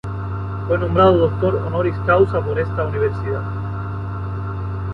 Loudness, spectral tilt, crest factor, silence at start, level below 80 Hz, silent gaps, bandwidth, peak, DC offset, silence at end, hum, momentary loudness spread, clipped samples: -20 LUFS; -9.5 dB/octave; 18 dB; 0.05 s; -34 dBFS; none; 5.2 kHz; 0 dBFS; under 0.1%; 0 s; none; 12 LU; under 0.1%